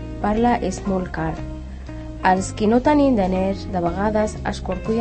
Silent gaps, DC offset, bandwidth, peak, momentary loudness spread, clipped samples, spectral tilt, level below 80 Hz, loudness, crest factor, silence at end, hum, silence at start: none; under 0.1%; 8.8 kHz; -4 dBFS; 16 LU; under 0.1%; -6.5 dB/octave; -34 dBFS; -21 LUFS; 18 dB; 0 s; none; 0 s